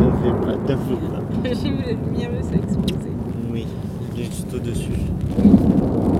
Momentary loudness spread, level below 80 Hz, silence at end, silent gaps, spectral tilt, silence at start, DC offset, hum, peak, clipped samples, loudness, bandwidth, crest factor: 12 LU; -32 dBFS; 0 s; none; -8 dB/octave; 0 s; 0.1%; none; 0 dBFS; under 0.1%; -21 LUFS; 15 kHz; 20 dB